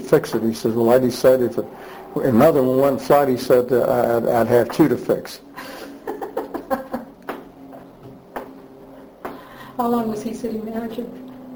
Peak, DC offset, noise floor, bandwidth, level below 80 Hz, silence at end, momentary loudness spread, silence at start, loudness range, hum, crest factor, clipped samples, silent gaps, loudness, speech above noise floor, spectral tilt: -2 dBFS; under 0.1%; -42 dBFS; over 20 kHz; -52 dBFS; 0 s; 19 LU; 0 s; 15 LU; none; 18 dB; under 0.1%; none; -19 LUFS; 24 dB; -6.5 dB/octave